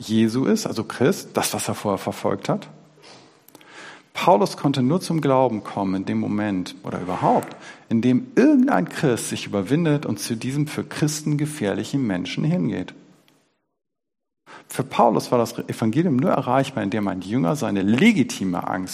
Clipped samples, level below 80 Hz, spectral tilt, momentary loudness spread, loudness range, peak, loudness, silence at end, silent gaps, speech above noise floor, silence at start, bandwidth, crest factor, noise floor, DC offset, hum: under 0.1%; -62 dBFS; -6 dB/octave; 9 LU; 5 LU; -2 dBFS; -22 LUFS; 0 s; none; 64 dB; 0 s; 15.5 kHz; 20 dB; -85 dBFS; under 0.1%; none